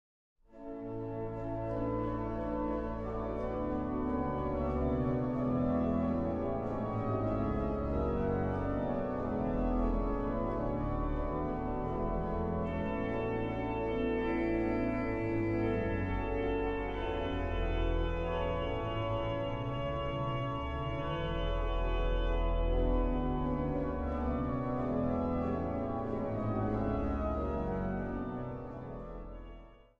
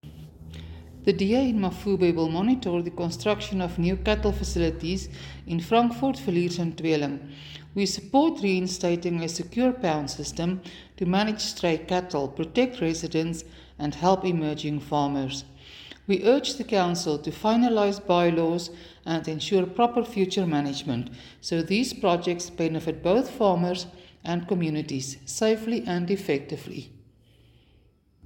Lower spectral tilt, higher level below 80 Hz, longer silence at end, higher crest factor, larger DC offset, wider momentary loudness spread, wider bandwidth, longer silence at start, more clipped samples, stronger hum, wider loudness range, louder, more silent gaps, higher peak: first, -9.5 dB/octave vs -5.5 dB/octave; first, -40 dBFS vs -46 dBFS; second, 0.25 s vs 1.3 s; about the same, 14 dB vs 18 dB; neither; second, 5 LU vs 14 LU; second, 5.4 kHz vs 17 kHz; first, 0.5 s vs 0.05 s; neither; neither; about the same, 2 LU vs 3 LU; second, -35 LUFS vs -26 LUFS; neither; second, -20 dBFS vs -8 dBFS